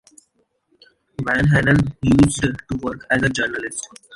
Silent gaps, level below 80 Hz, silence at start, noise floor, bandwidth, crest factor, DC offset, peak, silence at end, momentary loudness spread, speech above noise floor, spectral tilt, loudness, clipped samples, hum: none; -38 dBFS; 1.2 s; -66 dBFS; 11.5 kHz; 18 dB; under 0.1%; -2 dBFS; 0 s; 13 LU; 47 dB; -5.5 dB/octave; -19 LUFS; under 0.1%; none